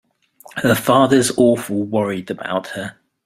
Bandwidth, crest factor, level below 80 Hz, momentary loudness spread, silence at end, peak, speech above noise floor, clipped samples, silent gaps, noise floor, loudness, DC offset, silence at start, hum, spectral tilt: 16 kHz; 16 dB; -54 dBFS; 15 LU; 0.35 s; -2 dBFS; 30 dB; under 0.1%; none; -47 dBFS; -17 LUFS; under 0.1%; 0.55 s; none; -5 dB/octave